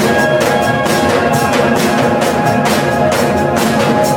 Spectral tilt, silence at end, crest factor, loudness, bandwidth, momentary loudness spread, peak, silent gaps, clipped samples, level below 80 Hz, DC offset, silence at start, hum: -5 dB/octave; 0 s; 12 dB; -12 LUFS; 17 kHz; 1 LU; 0 dBFS; none; under 0.1%; -40 dBFS; under 0.1%; 0 s; none